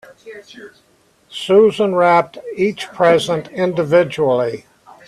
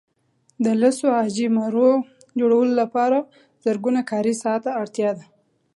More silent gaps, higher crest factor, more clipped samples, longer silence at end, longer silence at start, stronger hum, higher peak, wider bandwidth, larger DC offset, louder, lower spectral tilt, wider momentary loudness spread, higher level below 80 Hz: neither; about the same, 16 dB vs 16 dB; neither; about the same, 0.5 s vs 0.55 s; second, 0.25 s vs 0.6 s; neither; first, -2 dBFS vs -6 dBFS; about the same, 12.5 kHz vs 11.5 kHz; neither; first, -15 LUFS vs -21 LUFS; about the same, -5.5 dB/octave vs -5.5 dB/octave; first, 17 LU vs 7 LU; first, -60 dBFS vs -74 dBFS